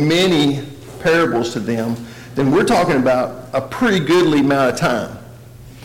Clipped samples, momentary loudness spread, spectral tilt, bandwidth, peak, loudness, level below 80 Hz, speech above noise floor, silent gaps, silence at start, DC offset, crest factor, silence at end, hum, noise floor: under 0.1%; 12 LU; -5.5 dB/octave; 17 kHz; -8 dBFS; -16 LUFS; -46 dBFS; 22 dB; none; 0 s; under 0.1%; 8 dB; 0 s; none; -38 dBFS